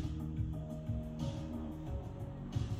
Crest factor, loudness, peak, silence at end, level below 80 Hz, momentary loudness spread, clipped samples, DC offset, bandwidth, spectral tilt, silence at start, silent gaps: 16 dB; -42 LUFS; -24 dBFS; 0 s; -46 dBFS; 4 LU; under 0.1%; under 0.1%; 14.5 kHz; -8 dB/octave; 0 s; none